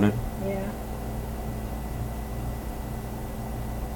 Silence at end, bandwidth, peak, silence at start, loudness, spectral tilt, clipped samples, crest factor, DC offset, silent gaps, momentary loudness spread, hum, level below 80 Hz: 0 s; 18 kHz; -10 dBFS; 0 s; -33 LUFS; -7 dB/octave; under 0.1%; 20 dB; under 0.1%; none; 4 LU; none; -36 dBFS